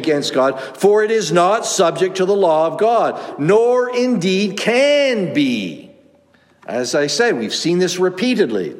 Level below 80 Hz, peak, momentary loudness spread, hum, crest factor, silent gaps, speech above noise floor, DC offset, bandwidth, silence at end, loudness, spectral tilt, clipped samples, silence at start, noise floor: -70 dBFS; -2 dBFS; 6 LU; none; 14 dB; none; 38 dB; under 0.1%; 16 kHz; 0 s; -16 LUFS; -4 dB/octave; under 0.1%; 0 s; -53 dBFS